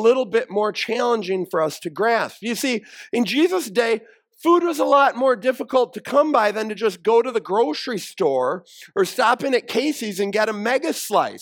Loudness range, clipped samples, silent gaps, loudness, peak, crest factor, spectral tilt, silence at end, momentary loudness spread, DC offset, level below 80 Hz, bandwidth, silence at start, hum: 3 LU; under 0.1%; none; -21 LUFS; -4 dBFS; 16 dB; -4 dB/octave; 0 s; 7 LU; under 0.1%; -76 dBFS; 18 kHz; 0 s; none